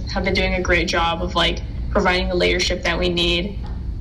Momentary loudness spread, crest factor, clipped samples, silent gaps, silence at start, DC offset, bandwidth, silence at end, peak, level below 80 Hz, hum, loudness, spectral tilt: 7 LU; 12 dB; under 0.1%; none; 0 s; under 0.1%; 11.5 kHz; 0 s; -8 dBFS; -28 dBFS; none; -19 LUFS; -4.5 dB/octave